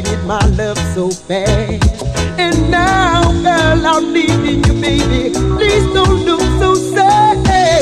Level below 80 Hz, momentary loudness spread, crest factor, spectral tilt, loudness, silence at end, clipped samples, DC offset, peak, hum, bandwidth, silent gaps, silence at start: -20 dBFS; 6 LU; 10 dB; -5 dB/octave; -12 LUFS; 0 s; under 0.1%; under 0.1%; 0 dBFS; none; 13.5 kHz; none; 0 s